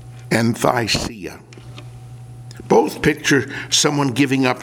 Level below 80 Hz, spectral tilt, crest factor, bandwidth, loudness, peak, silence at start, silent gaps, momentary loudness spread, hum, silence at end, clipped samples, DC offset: -46 dBFS; -4 dB/octave; 20 dB; 18 kHz; -17 LUFS; 0 dBFS; 0 s; none; 22 LU; none; 0 s; under 0.1%; under 0.1%